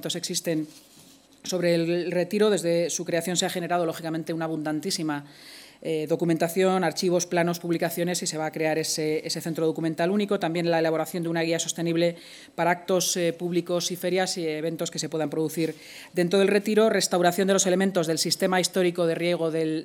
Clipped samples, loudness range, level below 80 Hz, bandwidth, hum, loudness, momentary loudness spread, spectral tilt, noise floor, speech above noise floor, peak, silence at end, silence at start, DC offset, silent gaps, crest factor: under 0.1%; 4 LU; -76 dBFS; 19 kHz; none; -25 LUFS; 8 LU; -4 dB/octave; -53 dBFS; 28 dB; -8 dBFS; 0 s; 0 s; under 0.1%; none; 18 dB